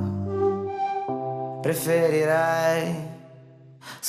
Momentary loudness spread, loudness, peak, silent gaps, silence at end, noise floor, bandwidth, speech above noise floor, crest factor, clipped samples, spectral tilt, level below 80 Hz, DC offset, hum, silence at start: 16 LU; -25 LUFS; -10 dBFS; none; 0 s; -48 dBFS; 14.5 kHz; 26 dB; 16 dB; under 0.1%; -5.5 dB/octave; -66 dBFS; under 0.1%; none; 0 s